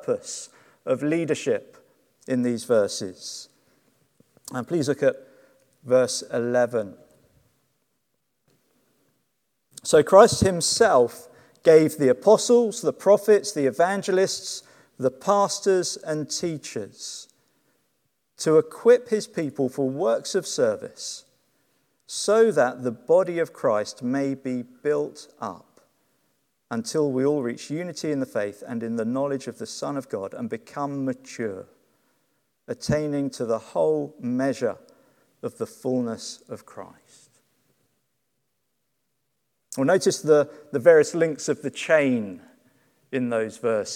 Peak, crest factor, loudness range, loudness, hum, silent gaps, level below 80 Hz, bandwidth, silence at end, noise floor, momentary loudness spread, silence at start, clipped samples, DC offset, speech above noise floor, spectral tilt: 0 dBFS; 24 dB; 11 LU; -23 LUFS; none; none; -60 dBFS; 15.5 kHz; 0 s; -77 dBFS; 17 LU; 0.05 s; under 0.1%; under 0.1%; 54 dB; -4.5 dB/octave